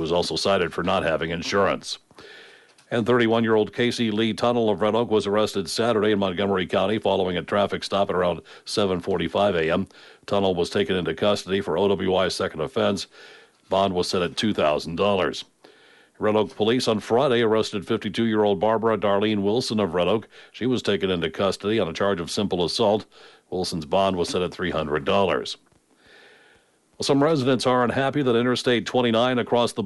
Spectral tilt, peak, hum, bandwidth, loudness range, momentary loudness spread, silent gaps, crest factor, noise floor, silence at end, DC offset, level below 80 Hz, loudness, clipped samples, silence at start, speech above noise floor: -5 dB/octave; -8 dBFS; none; 11.5 kHz; 3 LU; 6 LU; none; 14 dB; -60 dBFS; 0 s; under 0.1%; -56 dBFS; -23 LUFS; under 0.1%; 0 s; 37 dB